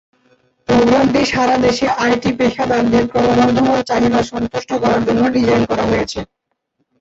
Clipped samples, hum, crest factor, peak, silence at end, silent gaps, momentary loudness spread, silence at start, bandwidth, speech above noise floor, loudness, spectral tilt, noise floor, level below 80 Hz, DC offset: under 0.1%; none; 14 dB; -2 dBFS; 0.75 s; none; 7 LU; 0.7 s; 8 kHz; 55 dB; -15 LUFS; -5.5 dB/octave; -69 dBFS; -40 dBFS; under 0.1%